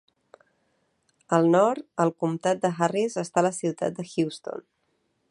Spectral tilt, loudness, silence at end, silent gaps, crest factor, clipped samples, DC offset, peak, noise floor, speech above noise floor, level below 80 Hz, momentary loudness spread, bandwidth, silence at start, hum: -6 dB/octave; -25 LUFS; 0.7 s; none; 20 dB; under 0.1%; under 0.1%; -6 dBFS; -73 dBFS; 48 dB; -72 dBFS; 10 LU; 11.5 kHz; 1.3 s; none